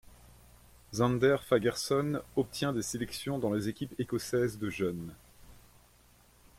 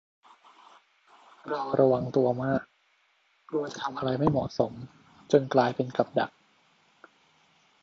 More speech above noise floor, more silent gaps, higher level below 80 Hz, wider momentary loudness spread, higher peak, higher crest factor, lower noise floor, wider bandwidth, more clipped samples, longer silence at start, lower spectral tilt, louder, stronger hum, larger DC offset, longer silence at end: second, 31 dB vs 42 dB; neither; about the same, -60 dBFS vs -62 dBFS; about the same, 9 LU vs 11 LU; second, -14 dBFS vs -6 dBFS; about the same, 20 dB vs 24 dB; second, -62 dBFS vs -68 dBFS; first, 16.5 kHz vs 7.6 kHz; neither; second, 0.05 s vs 1.45 s; second, -5.5 dB/octave vs -7 dB/octave; second, -32 LUFS vs -28 LUFS; first, 60 Hz at -55 dBFS vs none; neither; second, 1.05 s vs 1.55 s